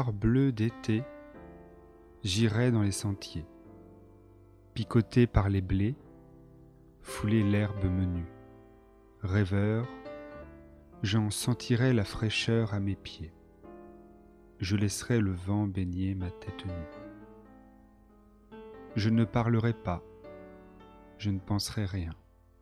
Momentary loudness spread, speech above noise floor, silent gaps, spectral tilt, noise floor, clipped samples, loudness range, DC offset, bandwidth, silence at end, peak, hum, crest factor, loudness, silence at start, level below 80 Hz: 22 LU; 29 dB; none; -6 dB/octave; -58 dBFS; under 0.1%; 4 LU; under 0.1%; 13.5 kHz; 0.5 s; -8 dBFS; none; 22 dB; -30 LUFS; 0 s; -48 dBFS